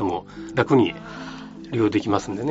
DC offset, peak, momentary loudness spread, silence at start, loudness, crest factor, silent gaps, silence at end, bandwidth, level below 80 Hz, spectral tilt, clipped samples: under 0.1%; -2 dBFS; 17 LU; 0 s; -22 LUFS; 22 dB; none; 0 s; 8 kHz; -54 dBFS; -5.5 dB/octave; under 0.1%